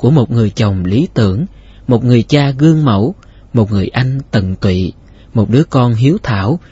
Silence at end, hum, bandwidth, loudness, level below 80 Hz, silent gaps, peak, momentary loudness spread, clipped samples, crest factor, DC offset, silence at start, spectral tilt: 0.15 s; none; 8 kHz; -13 LUFS; -38 dBFS; none; 0 dBFS; 8 LU; under 0.1%; 12 dB; under 0.1%; 0 s; -8 dB/octave